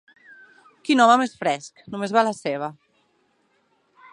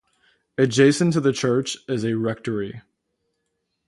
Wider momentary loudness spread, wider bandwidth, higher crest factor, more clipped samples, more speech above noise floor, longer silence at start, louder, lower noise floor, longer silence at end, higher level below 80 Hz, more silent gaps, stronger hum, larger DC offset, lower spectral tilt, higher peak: first, 18 LU vs 12 LU; about the same, 11 kHz vs 11.5 kHz; about the same, 22 dB vs 18 dB; neither; second, 45 dB vs 55 dB; first, 0.85 s vs 0.6 s; about the same, -21 LUFS vs -21 LUFS; second, -66 dBFS vs -76 dBFS; first, 1.4 s vs 1.1 s; second, -72 dBFS vs -62 dBFS; neither; neither; neither; second, -4 dB/octave vs -5.5 dB/octave; about the same, -2 dBFS vs -4 dBFS